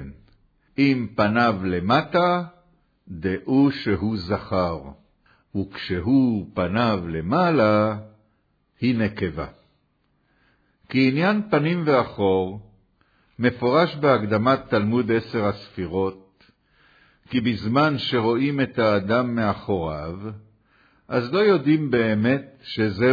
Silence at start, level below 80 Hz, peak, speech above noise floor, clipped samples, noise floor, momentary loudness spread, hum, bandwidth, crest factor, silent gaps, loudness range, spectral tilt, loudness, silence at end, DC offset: 0 s; -52 dBFS; -4 dBFS; 46 dB; under 0.1%; -67 dBFS; 11 LU; none; 5 kHz; 18 dB; none; 3 LU; -8.5 dB/octave; -22 LUFS; 0 s; under 0.1%